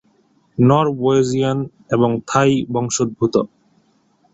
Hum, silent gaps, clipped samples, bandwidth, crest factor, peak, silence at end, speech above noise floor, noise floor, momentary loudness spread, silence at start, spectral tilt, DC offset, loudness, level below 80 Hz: none; none; under 0.1%; 8.2 kHz; 16 dB; -2 dBFS; 0.9 s; 42 dB; -59 dBFS; 7 LU; 0.6 s; -6 dB/octave; under 0.1%; -17 LUFS; -54 dBFS